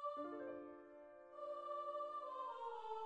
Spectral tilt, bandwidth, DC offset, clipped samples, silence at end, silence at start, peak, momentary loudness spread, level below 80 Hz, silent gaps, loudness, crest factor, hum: -5 dB/octave; 9.4 kHz; under 0.1%; under 0.1%; 0 s; 0 s; -36 dBFS; 12 LU; under -90 dBFS; none; -49 LUFS; 12 dB; none